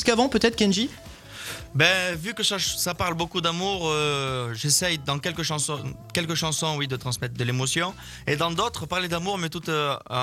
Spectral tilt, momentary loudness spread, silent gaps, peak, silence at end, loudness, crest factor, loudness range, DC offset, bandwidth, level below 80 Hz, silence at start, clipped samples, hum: -3.5 dB/octave; 9 LU; none; -2 dBFS; 0 s; -25 LUFS; 22 dB; 3 LU; under 0.1%; 16.5 kHz; -50 dBFS; 0 s; under 0.1%; none